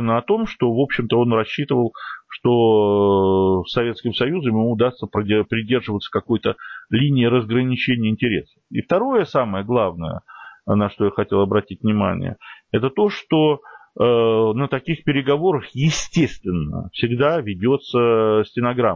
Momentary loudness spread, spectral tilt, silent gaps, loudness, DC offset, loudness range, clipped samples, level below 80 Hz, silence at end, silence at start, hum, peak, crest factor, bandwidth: 9 LU; -6.5 dB/octave; none; -19 LUFS; under 0.1%; 3 LU; under 0.1%; -46 dBFS; 0 s; 0 s; none; -6 dBFS; 14 dB; 7.6 kHz